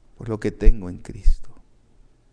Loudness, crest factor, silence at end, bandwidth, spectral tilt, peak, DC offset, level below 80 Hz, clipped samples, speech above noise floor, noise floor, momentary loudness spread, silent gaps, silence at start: -27 LUFS; 20 dB; 0.8 s; 5.4 kHz; -8 dB/octave; 0 dBFS; under 0.1%; -22 dBFS; under 0.1%; 37 dB; -53 dBFS; 11 LU; none; 0.25 s